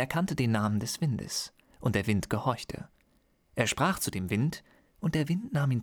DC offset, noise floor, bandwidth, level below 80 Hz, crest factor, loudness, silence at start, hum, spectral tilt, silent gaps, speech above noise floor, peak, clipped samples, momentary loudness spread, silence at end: under 0.1%; -68 dBFS; over 20 kHz; -56 dBFS; 18 dB; -30 LUFS; 0 s; none; -5 dB/octave; none; 39 dB; -12 dBFS; under 0.1%; 13 LU; 0 s